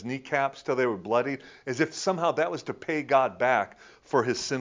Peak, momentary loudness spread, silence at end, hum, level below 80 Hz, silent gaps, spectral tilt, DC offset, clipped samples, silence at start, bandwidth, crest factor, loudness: -8 dBFS; 9 LU; 0 s; none; -68 dBFS; none; -4.5 dB/octave; under 0.1%; under 0.1%; 0 s; 7.6 kHz; 18 dB; -27 LUFS